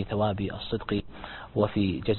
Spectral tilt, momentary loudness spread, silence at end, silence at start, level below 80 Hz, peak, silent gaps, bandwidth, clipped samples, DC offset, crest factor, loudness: -11 dB/octave; 10 LU; 0 s; 0 s; -46 dBFS; -10 dBFS; none; 4.3 kHz; under 0.1%; under 0.1%; 20 dB; -29 LUFS